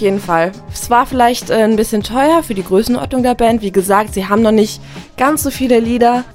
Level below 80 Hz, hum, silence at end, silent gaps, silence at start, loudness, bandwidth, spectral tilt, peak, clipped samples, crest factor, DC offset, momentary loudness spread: -36 dBFS; none; 0 s; none; 0 s; -13 LUFS; 16.5 kHz; -5 dB/octave; 0 dBFS; under 0.1%; 14 dB; under 0.1%; 5 LU